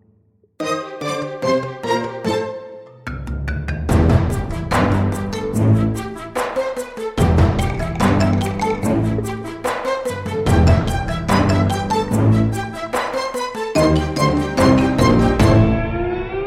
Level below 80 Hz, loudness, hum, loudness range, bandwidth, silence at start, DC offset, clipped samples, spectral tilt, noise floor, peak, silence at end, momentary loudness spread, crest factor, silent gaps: -28 dBFS; -18 LUFS; none; 5 LU; 15 kHz; 0.6 s; under 0.1%; under 0.1%; -6.5 dB/octave; -57 dBFS; -2 dBFS; 0 s; 10 LU; 16 dB; none